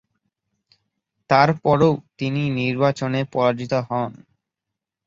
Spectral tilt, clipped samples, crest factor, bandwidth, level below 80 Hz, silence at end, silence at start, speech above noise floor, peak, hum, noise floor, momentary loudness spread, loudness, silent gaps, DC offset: -7 dB/octave; under 0.1%; 22 dB; 7.6 kHz; -56 dBFS; 0.95 s; 1.3 s; 65 dB; 0 dBFS; none; -84 dBFS; 9 LU; -20 LUFS; none; under 0.1%